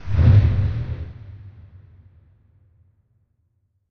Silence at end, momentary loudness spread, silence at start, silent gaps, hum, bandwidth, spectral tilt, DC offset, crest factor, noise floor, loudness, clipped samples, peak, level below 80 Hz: 2.4 s; 26 LU; 0 s; none; none; 5.2 kHz; -10 dB/octave; under 0.1%; 18 dB; -68 dBFS; -19 LUFS; under 0.1%; -4 dBFS; -30 dBFS